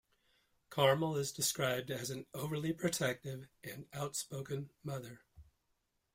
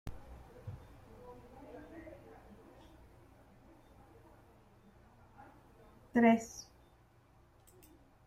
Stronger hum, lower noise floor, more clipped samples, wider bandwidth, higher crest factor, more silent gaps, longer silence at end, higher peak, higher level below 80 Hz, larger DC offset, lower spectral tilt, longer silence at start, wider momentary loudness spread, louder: neither; first, -82 dBFS vs -65 dBFS; neither; first, 16.5 kHz vs 14.5 kHz; about the same, 22 dB vs 26 dB; neither; second, 0.7 s vs 1.65 s; about the same, -16 dBFS vs -16 dBFS; second, -72 dBFS vs -62 dBFS; neither; second, -4 dB/octave vs -6 dB/octave; first, 0.7 s vs 0.05 s; second, 15 LU vs 30 LU; second, -37 LUFS vs -31 LUFS